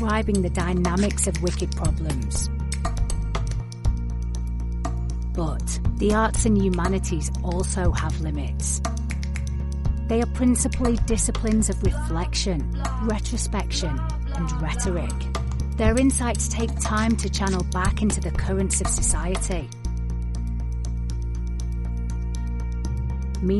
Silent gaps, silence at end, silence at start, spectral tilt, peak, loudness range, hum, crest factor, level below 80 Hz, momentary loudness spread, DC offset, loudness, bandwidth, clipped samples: none; 0 s; 0 s; -5 dB/octave; -8 dBFS; 5 LU; none; 16 dB; -26 dBFS; 8 LU; 0.2%; -25 LUFS; 11.5 kHz; under 0.1%